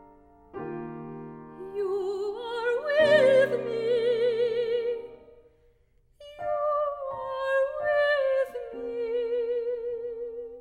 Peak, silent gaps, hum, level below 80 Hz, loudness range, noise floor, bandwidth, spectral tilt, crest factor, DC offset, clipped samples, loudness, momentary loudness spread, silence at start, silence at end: -10 dBFS; none; none; -64 dBFS; 6 LU; -63 dBFS; 10 kHz; -5 dB/octave; 18 dB; under 0.1%; under 0.1%; -27 LUFS; 16 LU; 0.55 s; 0 s